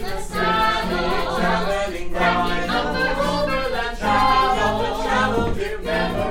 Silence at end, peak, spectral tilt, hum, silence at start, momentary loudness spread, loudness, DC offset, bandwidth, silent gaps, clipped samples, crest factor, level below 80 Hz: 0 s; -4 dBFS; -5 dB/octave; none; 0 s; 6 LU; -21 LUFS; under 0.1%; 16.5 kHz; none; under 0.1%; 16 dB; -32 dBFS